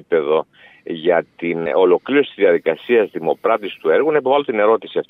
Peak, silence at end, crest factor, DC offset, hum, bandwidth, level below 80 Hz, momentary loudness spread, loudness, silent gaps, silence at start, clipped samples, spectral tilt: -2 dBFS; 0.1 s; 14 dB; under 0.1%; none; 4 kHz; -70 dBFS; 6 LU; -17 LUFS; none; 0.1 s; under 0.1%; -8 dB/octave